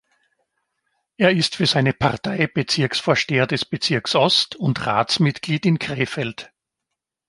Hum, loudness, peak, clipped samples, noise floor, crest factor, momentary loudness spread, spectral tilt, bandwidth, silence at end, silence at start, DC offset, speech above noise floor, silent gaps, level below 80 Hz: none; -20 LUFS; -2 dBFS; under 0.1%; -82 dBFS; 20 dB; 6 LU; -5 dB/octave; 11.5 kHz; 0.85 s; 1.2 s; under 0.1%; 62 dB; none; -54 dBFS